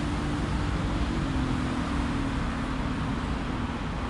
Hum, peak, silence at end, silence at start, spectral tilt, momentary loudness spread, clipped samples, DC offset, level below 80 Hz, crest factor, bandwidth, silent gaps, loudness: none; -16 dBFS; 0 s; 0 s; -6.5 dB/octave; 2 LU; under 0.1%; under 0.1%; -34 dBFS; 12 dB; 11.5 kHz; none; -30 LUFS